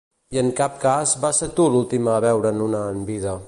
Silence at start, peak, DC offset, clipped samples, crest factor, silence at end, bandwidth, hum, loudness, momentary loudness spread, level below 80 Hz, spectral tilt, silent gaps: 0.3 s; -6 dBFS; under 0.1%; under 0.1%; 14 dB; 0 s; 11.5 kHz; none; -20 LUFS; 8 LU; -50 dBFS; -5 dB/octave; none